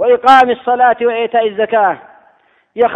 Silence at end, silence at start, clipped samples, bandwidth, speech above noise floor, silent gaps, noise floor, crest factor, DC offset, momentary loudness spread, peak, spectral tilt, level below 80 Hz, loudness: 0 s; 0 s; 0.6%; 10 kHz; 41 dB; none; -52 dBFS; 12 dB; under 0.1%; 8 LU; 0 dBFS; -4.5 dB/octave; -56 dBFS; -12 LUFS